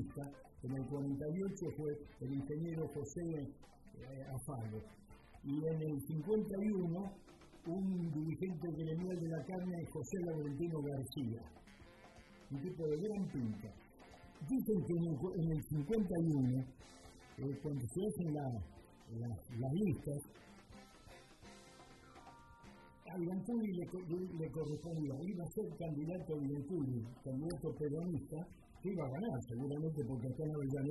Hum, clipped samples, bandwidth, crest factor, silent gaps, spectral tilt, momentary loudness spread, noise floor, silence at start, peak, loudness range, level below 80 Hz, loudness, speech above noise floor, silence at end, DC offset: none; under 0.1%; 12 kHz; 16 dB; none; -8 dB/octave; 21 LU; -61 dBFS; 0 s; -26 dBFS; 6 LU; -64 dBFS; -42 LUFS; 20 dB; 0 s; under 0.1%